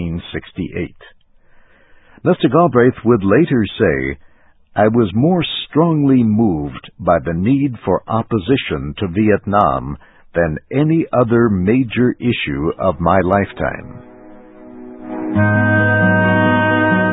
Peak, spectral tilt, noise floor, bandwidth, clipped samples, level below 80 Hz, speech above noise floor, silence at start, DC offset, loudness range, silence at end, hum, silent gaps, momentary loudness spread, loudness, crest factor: 0 dBFS; -11 dB/octave; -48 dBFS; 4 kHz; under 0.1%; -38 dBFS; 33 dB; 0 s; under 0.1%; 3 LU; 0 s; none; none; 13 LU; -15 LUFS; 16 dB